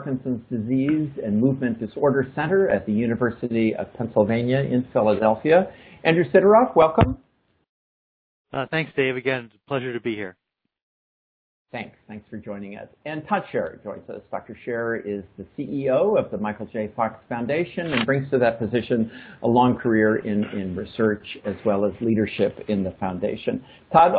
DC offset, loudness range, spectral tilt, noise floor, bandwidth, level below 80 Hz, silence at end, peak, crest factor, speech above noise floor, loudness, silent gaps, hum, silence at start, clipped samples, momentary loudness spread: under 0.1%; 12 LU; -11 dB/octave; under -90 dBFS; 4.9 kHz; -50 dBFS; 0 s; 0 dBFS; 22 dB; over 68 dB; -23 LUFS; 7.69-8.45 s, 10.83-11.65 s; none; 0 s; under 0.1%; 16 LU